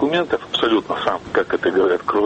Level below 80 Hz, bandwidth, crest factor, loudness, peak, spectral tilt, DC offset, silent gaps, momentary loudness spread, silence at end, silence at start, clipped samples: -52 dBFS; 8.4 kHz; 14 dB; -19 LUFS; -4 dBFS; -5.5 dB/octave; under 0.1%; none; 4 LU; 0 s; 0 s; under 0.1%